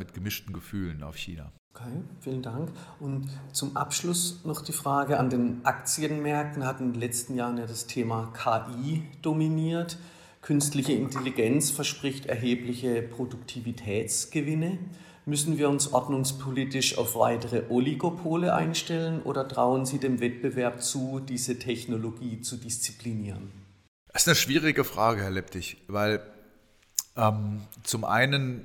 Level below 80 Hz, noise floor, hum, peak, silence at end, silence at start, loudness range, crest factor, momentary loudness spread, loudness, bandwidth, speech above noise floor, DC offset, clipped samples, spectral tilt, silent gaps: -60 dBFS; -60 dBFS; none; -4 dBFS; 0 s; 0 s; 5 LU; 24 dB; 11 LU; -29 LUFS; 18 kHz; 31 dB; under 0.1%; under 0.1%; -4 dB/octave; 1.59-1.71 s, 23.88-24.06 s